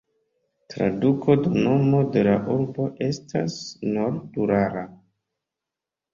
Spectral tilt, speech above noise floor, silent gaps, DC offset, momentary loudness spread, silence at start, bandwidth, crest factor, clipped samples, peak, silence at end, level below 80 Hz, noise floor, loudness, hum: -7.5 dB/octave; 65 dB; none; under 0.1%; 10 LU; 0.7 s; 7.4 kHz; 18 dB; under 0.1%; -6 dBFS; 1.2 s; -56 dBFS; -87 dBFS; -23 LUFS; none